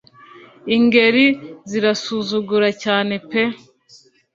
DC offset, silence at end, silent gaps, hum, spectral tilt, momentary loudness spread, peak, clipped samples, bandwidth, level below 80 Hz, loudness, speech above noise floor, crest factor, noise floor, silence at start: under 0.1%; 0.8 s; none; none; -4.5 dB/octave; 13 LU; -2 dBFS; under 0.1%; 7.6 kHz; -62 dBFS; -17 LUFS; 34 dB; 18 dB; -50 dBFS; 0.35 s